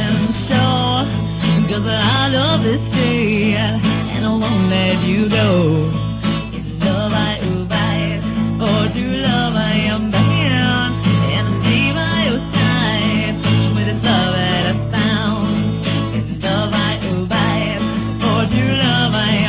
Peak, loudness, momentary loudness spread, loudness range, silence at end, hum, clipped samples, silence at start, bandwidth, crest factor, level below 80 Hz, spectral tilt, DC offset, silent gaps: -2 dBFS; -16 LUFS; 5 LU; 2 LU; 0 s; none; under 0.1%; 0 s; 4 kHz; 14 dB; -34 dBFS; -10.5 dB/octave; under 0.1%; none